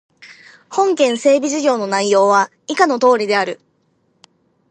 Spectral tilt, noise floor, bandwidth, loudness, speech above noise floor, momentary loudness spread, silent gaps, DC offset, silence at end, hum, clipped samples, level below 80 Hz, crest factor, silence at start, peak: -3.5 dB/octave; -62 dBFS; 9.8 kHz; -15 LUFS; 47 dB; 8 LU; none; under 0.1%; 1.15 s; none; under 0.1%; -72 dBFS; 16 dB; 0.25 s; 0 dBFS